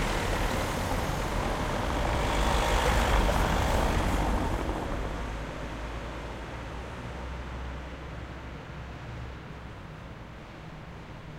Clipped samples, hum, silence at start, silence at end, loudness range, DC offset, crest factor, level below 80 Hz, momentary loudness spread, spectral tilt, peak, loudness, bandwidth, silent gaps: under 0.1%; none; 0 s; 0 s; 14 LU; under 0.1%; 20 dB; -34 dBFS; 17 LU; -5 dB/octave; -10 dBFS; -31 LUFS; 16 kHz; none